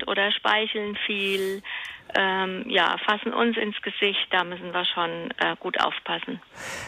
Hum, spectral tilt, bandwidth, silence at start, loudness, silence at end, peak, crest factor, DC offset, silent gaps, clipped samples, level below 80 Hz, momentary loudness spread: none; -3.5 dB/octave; 15.5 kHz; 0 s; -25 LUFS; 0 s; -8 dBFS; 18 dB; under 0.1%; none; under 0.1%; -66 dBFS; 8 LU